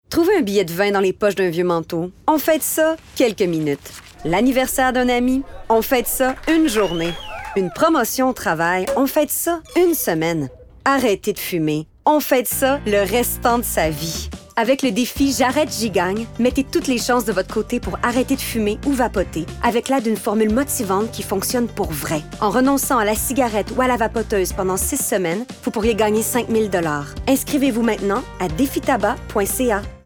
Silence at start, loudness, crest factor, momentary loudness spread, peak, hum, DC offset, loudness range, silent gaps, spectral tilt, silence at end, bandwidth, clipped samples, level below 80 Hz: 0.1 s; -19 LUFS; 16 dB; 6 LU; -2 dBFS; none; under 0.1%; 1 LU; none; -4 dB/octave; 0.1 s; over 20 kHz; under 0.1%; -38 dBFS